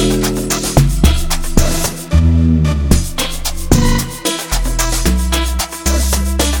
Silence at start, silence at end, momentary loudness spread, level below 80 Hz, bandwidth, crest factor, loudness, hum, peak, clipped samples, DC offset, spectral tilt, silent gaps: 0 s; 0 s; 6 LU; -16 dBFS; 17.5 kHz; 14 dB; -15 LUFS; none; 0 dBFS; under 0.1%; under 0.1%; -4.5 dB/octave; none